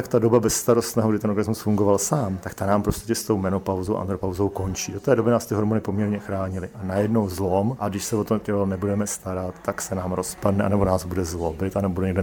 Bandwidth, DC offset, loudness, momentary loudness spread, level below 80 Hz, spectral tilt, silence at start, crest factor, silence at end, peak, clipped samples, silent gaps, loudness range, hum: 19.5 kHz; under 0.1%; -24 LUFS; 8 LU; -46 dBFS; -6 dB/octave; 0 s; 18 dB; 0 s; -4 dBFS; under 0.1%; none; 3 LU; none